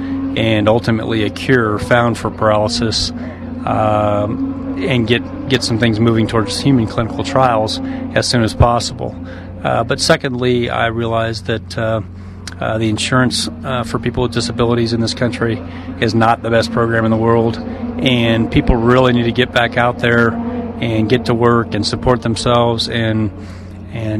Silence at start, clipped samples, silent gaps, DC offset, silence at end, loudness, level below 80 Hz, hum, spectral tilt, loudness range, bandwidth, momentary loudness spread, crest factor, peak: 0 s; under 0.1%; none; under 0.1%; 0 s; -15 LUFS; -34 dBFS; none; -5.5 dB/octave; 3 LU; 13 kHz; 9 LU; 16 dB; 0 dBFS